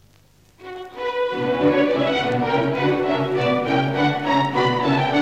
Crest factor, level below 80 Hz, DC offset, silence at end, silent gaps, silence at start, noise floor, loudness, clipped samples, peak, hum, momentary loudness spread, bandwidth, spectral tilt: 14 dB; -56 dBFS; 0.3%; 0 s; none; 0.6 s; -54 dBFS; -20 LUFS; under 0.1%; -8 dBFS; none; 7 LU; 9 kHz; -6.5 dB/octave